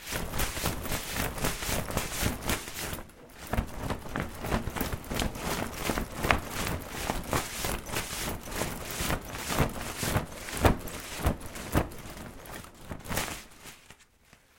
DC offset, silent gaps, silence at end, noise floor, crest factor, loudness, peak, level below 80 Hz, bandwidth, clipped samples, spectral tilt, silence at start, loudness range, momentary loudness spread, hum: under 0.1%; none; 0.55 s; -60 dBFS; 32 dB; -32 LUFS; 0 dBFS; -40 dBFS; 17 kHz; under 0.1%; -4 dB/octave; 0 s; 3 LU; 14 LU; none